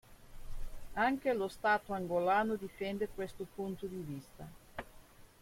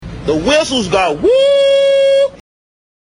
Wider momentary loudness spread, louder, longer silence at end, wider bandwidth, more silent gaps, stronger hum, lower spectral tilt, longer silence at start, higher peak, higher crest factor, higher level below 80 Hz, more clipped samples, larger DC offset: first, 21 LU vs 6 LU; second, -36 LUFS vs -12 LUFS; second, 0.15 s vs 0.65 s; first, 16.5 kHz vs 11 kHz; neither; neither; first, -6 dB/octave vs -4 dB/octave; about the same, 0.1 s vs 0 s; second, -18 dBFS vs 0 dBFS; first, 20 dB vs 12 dB; second, -52 dBFS vs -38 dBFS; neither; neither